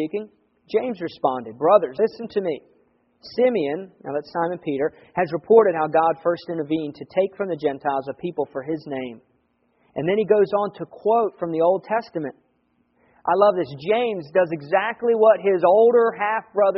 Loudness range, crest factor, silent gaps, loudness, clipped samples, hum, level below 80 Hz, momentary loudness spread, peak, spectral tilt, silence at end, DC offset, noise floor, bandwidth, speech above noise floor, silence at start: 6 LU; 20 dB; none; -22 LUFS; under 0.1%; none; -68 dBFS; 13 LU; -2 dBFS; -4.5 dB/octave; 0 s; under 0.1%; -66 dBFS; 5.8 kHz; 45 dB; 0 s